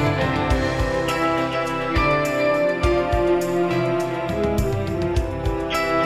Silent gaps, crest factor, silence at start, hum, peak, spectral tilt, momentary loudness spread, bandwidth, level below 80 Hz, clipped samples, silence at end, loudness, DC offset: none; 14 dB; 0 s; none; -6 dBFS; -6 dB/octave; 4 LU; 14.5 kHz; -32 dBFS; under 0.1%; 0 s; -21 LUFS; under 0.1%